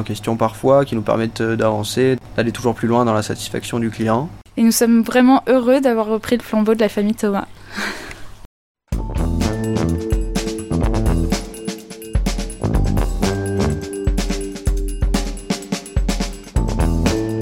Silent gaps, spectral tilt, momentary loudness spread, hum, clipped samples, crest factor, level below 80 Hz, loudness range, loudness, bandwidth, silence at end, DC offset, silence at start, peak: 8.45-8.75 s; -6 dB/octave; 11 LU; none; under 0.1%; 16 dB; -26 dBFS; 7 LU; -19 LUFS; 16.5 kHz; 0 s; under 0.1%; 0 s; -2 dBFS